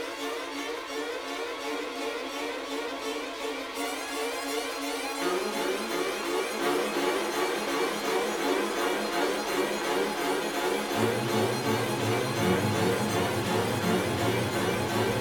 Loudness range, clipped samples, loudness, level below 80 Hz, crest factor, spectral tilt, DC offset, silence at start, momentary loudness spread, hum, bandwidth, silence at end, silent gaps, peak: 6 LU; under 0.1%; -29 LUFS; -60 dBFS; 16 dB; -4 dB/octave; under 0.1%; 0 s; 7 LU; none; over 20 kHz; 0 s; none; -12 dBFS